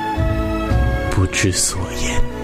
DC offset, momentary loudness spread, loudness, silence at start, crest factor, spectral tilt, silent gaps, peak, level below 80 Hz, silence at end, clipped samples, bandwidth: under 0.1%; 6 LU; -19 LUFS; 0 s; 12 dB; -4 dB/octave; none; -6 dBFS; -24 dBFS; 0 s; under 0.1%; 16 kHz